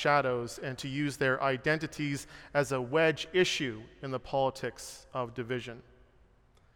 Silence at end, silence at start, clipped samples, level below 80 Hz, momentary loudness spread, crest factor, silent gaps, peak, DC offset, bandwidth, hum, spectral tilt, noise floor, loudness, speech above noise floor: 0.95 s; 0 s; under 0.1%; -60 dBFS; 12 LU; 20 dB; none; -12 dBFS; under 0.1%; 17 kHz; none; -4.5 dB/octave; -63 dBFS; -32 LUFS; 32 dB